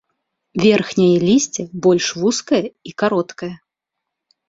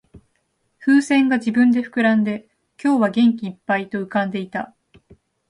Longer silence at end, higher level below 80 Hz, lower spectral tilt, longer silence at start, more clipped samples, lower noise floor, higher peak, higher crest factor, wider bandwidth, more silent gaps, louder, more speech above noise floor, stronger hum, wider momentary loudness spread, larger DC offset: about the same, 0.95 s vs 0.85 s; first, -56 dBFS vs -62 dBFS; about the same, -5 dB/octave vs -6 dB/octave; second, 0.55 s vs 0.8 s; neither; first, -81 dBFS vs -69 dBFS; first, -2 dBFS vs -6 dBFS; about the same, 16 dB vs 14 dB; second, 7.8 kHz vs 11 kHz; neither; about the same, -17 LUFS vs -19 LUFS; first, 64 dB vs 50 dB; neither; about the same, 14 LU vs 12 LU; neither